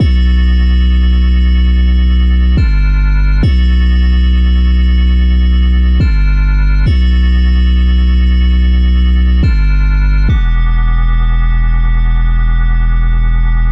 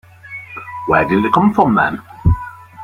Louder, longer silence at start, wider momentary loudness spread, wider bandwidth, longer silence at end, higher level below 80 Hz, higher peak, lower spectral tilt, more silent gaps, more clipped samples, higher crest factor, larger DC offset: first, -12 LUFS vs -15 LUFS; second, 0 s vs 0.25 s; second, 3 LU vs 18 LU; second, 5.6 kHz vs 9.8 kHz; about the same, 0 s vs 0 s; first, -8 dBFS vs -32 dBFS; about the same, -2 dBFS vs 0 dBFS; about the same, -8 dB/octave vs -8.5 dB/octave; neither; neither; second, 6 dB vs 16 dB; neither